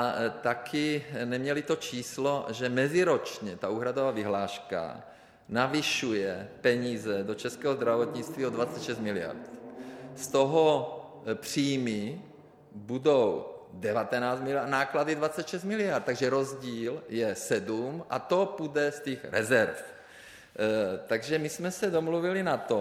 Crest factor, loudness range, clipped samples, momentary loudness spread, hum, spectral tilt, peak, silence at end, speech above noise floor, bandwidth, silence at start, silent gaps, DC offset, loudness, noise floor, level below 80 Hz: 20 dB; 2 LU; under 0.1%; 13 LU; none; -4.5 dB/octave; -10 dBFS; 0 s; 22 dB; 16 kHz; 0 s; none; under 0.1%; -30 LUFS; -51 dBFS; -70 dBFS